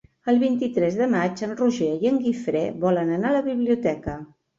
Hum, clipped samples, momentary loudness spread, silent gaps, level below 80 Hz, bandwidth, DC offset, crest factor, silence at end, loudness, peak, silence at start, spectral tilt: none; under 0.1%; 5 LU; none; -54 dBFS; 7.6 kHz; under 0.1%; 14 dB; 0.35 s; -23 LUFS; -10 dBFS; 0.25 s; -7 dB/octave